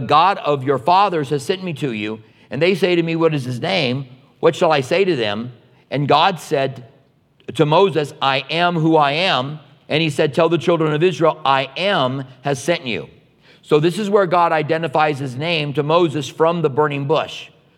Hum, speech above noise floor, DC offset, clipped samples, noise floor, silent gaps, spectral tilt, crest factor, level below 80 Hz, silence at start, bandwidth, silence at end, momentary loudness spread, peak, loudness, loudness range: none; 38 dB; under 0.1%; under 0.1%; -55 dBFS; none; -5.5 dB/octave; 18 dB; -68 dBFS; 0 s; 14.5 kHz; 0.3 s; 11 LU; 0 dBFS; -18 LUFS; 2 LU